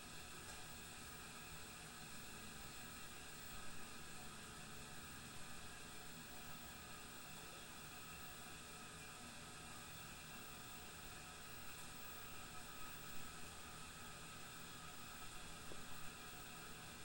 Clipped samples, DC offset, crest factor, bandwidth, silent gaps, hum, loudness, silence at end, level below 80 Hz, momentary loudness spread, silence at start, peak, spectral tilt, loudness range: under 0.1%; under 0.1%; 14 dB; 16 kHz; none; none; -53 LUFS; 0 s; -66 dBFS; 1 LU; 0 s; -38 dBFS; -2.5 dB/octave; 1 LU